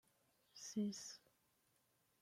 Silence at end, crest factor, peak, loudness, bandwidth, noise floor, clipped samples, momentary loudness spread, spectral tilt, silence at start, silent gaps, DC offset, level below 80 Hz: 1.05 s; 18 dB; -34 dBFS; -48 LUFS; 16 kHz; -81 dBFS; under 0.1%; 17 LU; -4.5 dB/octave; 0.55 s; none; under 0.1%; under -90 dBFS